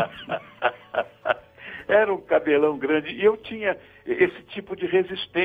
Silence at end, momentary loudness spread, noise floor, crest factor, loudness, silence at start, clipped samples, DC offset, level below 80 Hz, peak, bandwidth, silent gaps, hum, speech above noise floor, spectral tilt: 0 s; 12 LU; -41 dBFS; 18 dB; -24 LUFS; 0 s; under 0.1%; under 0.1%; -62 dBFS; -6 dBFS; 4.9 kHz; none; none; 18 dB; -7 dB/octave